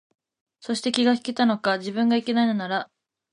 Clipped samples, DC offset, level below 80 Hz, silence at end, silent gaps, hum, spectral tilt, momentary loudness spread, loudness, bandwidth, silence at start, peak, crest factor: under 0.1%; under 0.1%; -74 dBFS; 0.5 s; none; none; -4.5 dB/octave; 8 LU; -23 LUFS; 11 kHz; 0.65 s; -6 dBFS; 18 dB